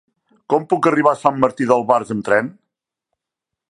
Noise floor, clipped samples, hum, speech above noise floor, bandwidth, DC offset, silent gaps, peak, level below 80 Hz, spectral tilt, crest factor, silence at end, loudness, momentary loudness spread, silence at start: -84 dBFS; under 0.1%; none; 67 dB; 11 kHz; under 0.1%; none; 0 dBFS; -60 dBFS; -6.5 dB/octave; 18 dB; 1.2 s; -17 LUFS; 5 LU; 0.5 s